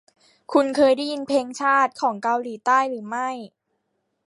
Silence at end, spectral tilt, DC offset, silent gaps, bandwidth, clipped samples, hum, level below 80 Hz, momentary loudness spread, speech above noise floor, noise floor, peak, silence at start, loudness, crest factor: 0.8 s; -3.5 dB/octave; under 0.1%; none; 11.5 kHz; under 0.1%; none; -72 dBFS; 9 LU; 53 dB; -74 dBFS; -4 dBFS; 0.5 s; -22 LUFS; 18 dB